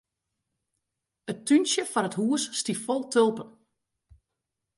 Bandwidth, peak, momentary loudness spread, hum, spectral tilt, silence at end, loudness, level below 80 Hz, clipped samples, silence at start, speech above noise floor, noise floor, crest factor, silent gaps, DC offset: 11.5 kHz; -10 dBFS; 16 LU; none; -3.5 dB/octave; 1.3 s; -26 LUFS; -70 dBFS; under 0.1%; 1.25 s; 59 dB; -84 dBFS; 20 dB; none; under 0.1%